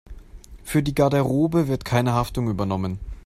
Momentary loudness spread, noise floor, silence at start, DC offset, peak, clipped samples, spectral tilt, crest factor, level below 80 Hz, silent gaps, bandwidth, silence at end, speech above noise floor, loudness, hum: 7 LU; -42 dBFS; 0.05 s; under 0.1%; -6 dBFS; under 0.1%; -7 dB/octave; 16 dB; -40 dBFS; none; 16 kHz; 0.05 s; 21 dB; -22 LUFS; none